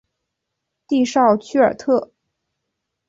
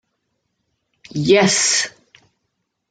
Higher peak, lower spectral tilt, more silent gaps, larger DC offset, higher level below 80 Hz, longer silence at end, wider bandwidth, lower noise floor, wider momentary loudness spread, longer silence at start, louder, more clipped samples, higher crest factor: about the same, -2 dBFS vs -2 dBFS; first, -5 dB/octave vs -3 dB/octave; neither; neither; about the same, -62 dBFS vs -60 dBFS; about the same, 1.05 s vs 1 s; second, 7.8 kHz vs 10 kHz; first, -79 dBFS vs -74 dBFS; second, 5 LU vs 14 LU; second, 0.9 s vs 1.15 s; second, -18 LUFS vs -15 LUFS; neither; about the same, 18 dB vs 20 dB